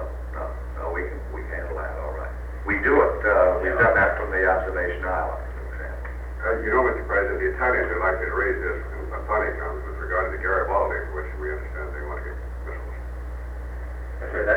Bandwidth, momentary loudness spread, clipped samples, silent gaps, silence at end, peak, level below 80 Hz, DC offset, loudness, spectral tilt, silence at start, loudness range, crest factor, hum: 5.4 kHz; 15 LU; under 0.1%; none; 0 s; -6 dBFS; -32 dBFS; under 0.1%; -25 LUFS; -8.5 dB/octave; 0 s; 7 LU; 18 dB; 60 Hz at -35 dBFS